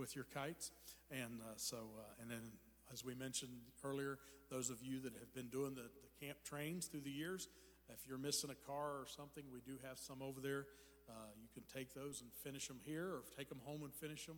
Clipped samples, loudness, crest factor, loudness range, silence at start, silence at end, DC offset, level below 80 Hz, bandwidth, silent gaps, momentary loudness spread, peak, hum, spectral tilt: under 0.1%; -50 LUFS; 22 dB; 4 LU; 0 s; 0 s; under 0.1%; -76 dBFS; over 20 kHz; none; 11 LU; -28 dBFS; none; -3.5 dB/octave